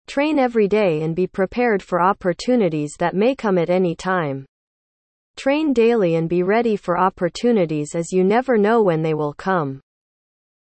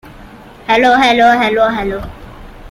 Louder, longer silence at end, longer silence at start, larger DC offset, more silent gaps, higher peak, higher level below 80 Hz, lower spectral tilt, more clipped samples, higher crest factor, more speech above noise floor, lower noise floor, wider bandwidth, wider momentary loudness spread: second, -19 LUFS vs -11 LUFS; first, 0.9 s vs 0 s; about the same, 0.1 s vs 0.05 s; neither; first, 4.48-5.34 s vs none; second, -6 dBFS vs 0 dBFS; second, -54 dBFS vs -36 dBFS; first, -6.5 dB/octave vs -4.5 dB/octave; neither; about the same, 14 dB vs 14 dB; first, over 72 dB vs 25 dB; first, under -90 dBFS vs -36 dBFS; second, 8.8 kHz vs 15 kHz; second, 6 LU vs 18 LU